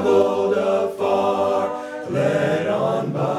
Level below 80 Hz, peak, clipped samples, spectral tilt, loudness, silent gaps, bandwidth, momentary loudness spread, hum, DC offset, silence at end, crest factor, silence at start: -64 dBFS; -6 dBFS; under 0.1%; -6.5 dB/octave; -20 LUFS; none; 13.5 kHz; 5 LU; none; under 0.1%; 0 s; 14 dB; 0 s